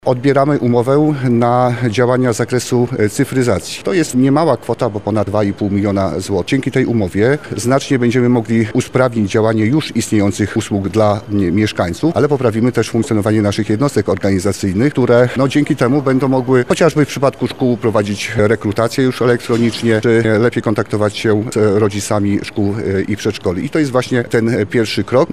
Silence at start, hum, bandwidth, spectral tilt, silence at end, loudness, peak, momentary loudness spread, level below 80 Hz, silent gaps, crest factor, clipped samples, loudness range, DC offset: 0.05 s; none; 15 kHz; -6.5 dB/octave; 0 s; -15 LUFS; 0 dBFS; 5 LU; -46 dBFS; none; 14 dB; under 0.1%; 2 LU; 0.8%